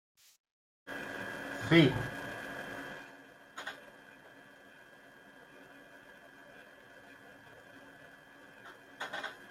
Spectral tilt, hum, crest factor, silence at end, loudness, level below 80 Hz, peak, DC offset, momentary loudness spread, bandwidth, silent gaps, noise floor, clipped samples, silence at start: -6 dB/octave; none; 28 dB; 0 s; -34 LUFS; -66 dBFS; -12 dBFS; under 0.1%; 23 LU; 15.5 kHz; none; -57 dBFS; under 0.1%; 0.85 s